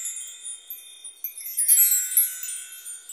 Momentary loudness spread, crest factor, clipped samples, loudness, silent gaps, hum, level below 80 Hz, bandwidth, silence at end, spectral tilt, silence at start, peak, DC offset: 21 LU; 20 dB; under 0.1%; -19 LUFS; none; none; -84 dBFS; 16 kHz; 0 s; 7 dB/octave; 0 s; -6 dBFS; under 0.1%